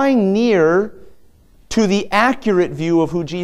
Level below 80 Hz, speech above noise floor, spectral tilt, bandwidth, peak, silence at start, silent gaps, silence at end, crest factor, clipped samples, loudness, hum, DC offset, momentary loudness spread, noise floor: -46 dBFS; 32 dB; -6 dB/octave; 13 kHz; 0 dBFS; 0 s; none; 0 s; 16 dB; under 0.1%; -16 LUFS; none; under 0.1%; 6 LU; -47 dBFS